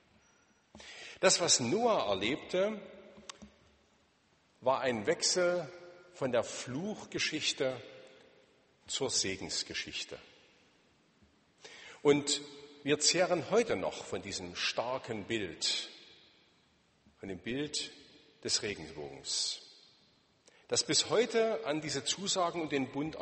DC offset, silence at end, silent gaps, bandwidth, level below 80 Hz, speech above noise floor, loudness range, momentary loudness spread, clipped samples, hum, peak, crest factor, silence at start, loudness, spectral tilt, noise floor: under 0.1%; 0 s; none; 8.8 kHz; -70 dBFS; 37 dB; 6 LU; 19 LU; under 0.1%; none; -12 dBFS; 24 dB; 0.75 s; -33 LUFS; -2.5 dB/octave; -70 dBFS